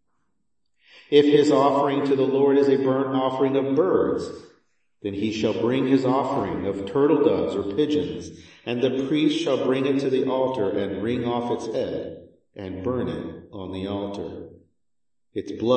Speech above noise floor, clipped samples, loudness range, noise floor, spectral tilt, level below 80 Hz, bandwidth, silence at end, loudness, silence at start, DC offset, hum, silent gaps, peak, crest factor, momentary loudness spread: 65 dB; under 0.1%; 10 LU; -87 dBFS; -6.5 dB/octave; -60 dBFS; 8.6 kHz; 0 s; -23 LUFS; 1.1 s; under 0.1%; none; none; -4 dBFS; 20 dB; 16 LU